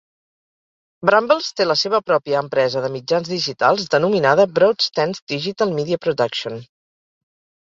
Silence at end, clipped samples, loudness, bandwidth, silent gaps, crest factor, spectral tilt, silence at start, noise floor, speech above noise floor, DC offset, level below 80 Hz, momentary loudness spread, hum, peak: 1 s; under 0.1%; -18 LUFS; 7.6 kHz; 5.22-5.27 s; 18 dB; -4.5 dB/octave; 1 s; under -90 dBFS; over 72 dB; under 0.1%; -62 dBFS; 8 LU; none; 0 dBFS